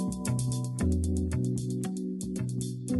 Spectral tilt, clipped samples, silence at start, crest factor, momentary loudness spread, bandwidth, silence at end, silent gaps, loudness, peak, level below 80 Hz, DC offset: -6.5 dB/octave; under 0.1%; 0 s; 14 dB; 5 LU; 12 kHz; 0 s; none; -31 LUFS; -16 dBFS; -42 dBFS; under 0.1%